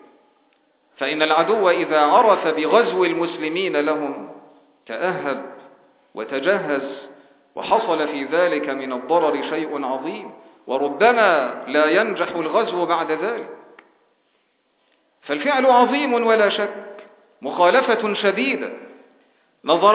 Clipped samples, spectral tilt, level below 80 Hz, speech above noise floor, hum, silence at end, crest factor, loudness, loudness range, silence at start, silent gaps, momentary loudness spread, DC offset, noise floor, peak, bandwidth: under 0.1%; -8 dB/octave; -74 dBFS; 47 dB; none; 0 s; 20 dB; -19 LUFS; 7 LU; 1 s; none; 17 LU; under 0.1%; -66 dBFS; -2 dBFS; 4 kHz